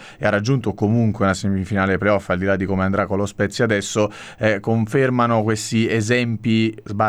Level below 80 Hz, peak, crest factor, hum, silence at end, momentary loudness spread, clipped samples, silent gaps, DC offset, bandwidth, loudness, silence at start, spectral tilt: -50 dBFS; -4 dBFS; 16 dB; none; 0 s; 4 LU; under 0.1%; none; under 0.1%; 13.5 kHz; -20 LUFS; 0 s; -6 dB/octave